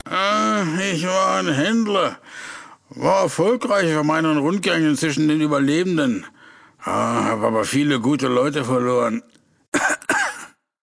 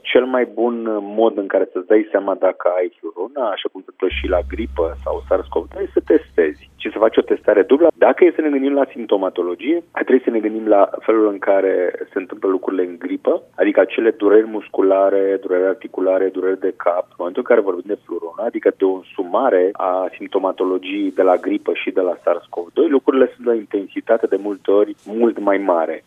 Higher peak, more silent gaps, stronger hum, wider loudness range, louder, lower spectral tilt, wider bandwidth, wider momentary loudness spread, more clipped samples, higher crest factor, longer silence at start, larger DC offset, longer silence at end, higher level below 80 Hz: second, -4 dBFS vs 0 dBFS; first, 9.68-9.72 s vs none; neither; about the same, 2 LU vs 4 LU; about the same, -20 LUFS vs -18 LUFS; second, -4.5 dB/octave vs -7.5 dB/octave; first, 11 kHz vs 3.8 kHz; about the same, 7 LU vs 9 LU; neither; about the same, 16 dB vs 16 dB; about the same, 0.05 s vs 0.05 s; neither; first, 0.4 s vs 0.1 s; second, -62 dBFS vs -42 dBFS